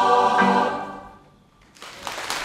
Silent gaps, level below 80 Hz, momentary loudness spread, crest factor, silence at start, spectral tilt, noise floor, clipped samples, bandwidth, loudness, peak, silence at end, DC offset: none; -60 dBFS; 23 LU; 18 dB; 0 s; -4 dB/octave; -54 dBFS; under 0.1%; 16 kHz; -21 LUFS; -4 dBFS; 0 s; under 0.1%